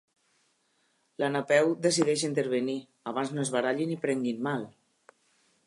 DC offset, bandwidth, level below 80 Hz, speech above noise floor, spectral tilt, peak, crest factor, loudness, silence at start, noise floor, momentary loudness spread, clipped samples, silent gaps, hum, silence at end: under 0.1%; 11.5 kHz; -80 dBFS; 44 dB; -4.5 dB/octave; -10 dBFS; 20 dB; -29 LUFS; 1.2 s; -72 dBFS; 10 LU; under 0.1%; none; none; 0.95 s